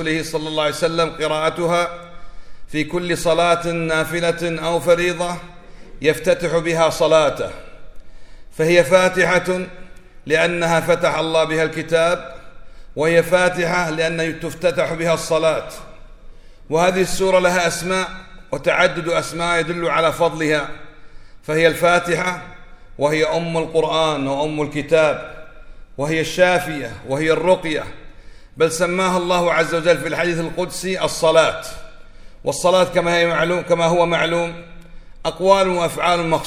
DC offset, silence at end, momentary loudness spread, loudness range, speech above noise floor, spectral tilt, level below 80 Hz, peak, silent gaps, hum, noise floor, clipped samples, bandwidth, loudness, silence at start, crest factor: under 0.1%; 0 s; 11 LU; 2 LU; 20 dB; -4.5 dB/octave; -42 dBFS; 0 dBFS; none; none; -38 dBFS; under 0.1%; 16 kHz; -18 LUFS; 0 s; 18 dB